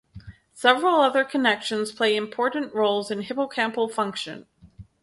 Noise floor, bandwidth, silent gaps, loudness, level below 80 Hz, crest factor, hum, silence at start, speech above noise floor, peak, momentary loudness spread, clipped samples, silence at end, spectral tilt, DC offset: -48 dBFS; 11.5 kHz; none; -23 LUFS; -60 dBFS; 20 dB; none; 0.15 s; 25 dB; -4 dBFS; 9 LU; under 0.1%; 0.2 s; -3.5 dB/octave; under 0.1%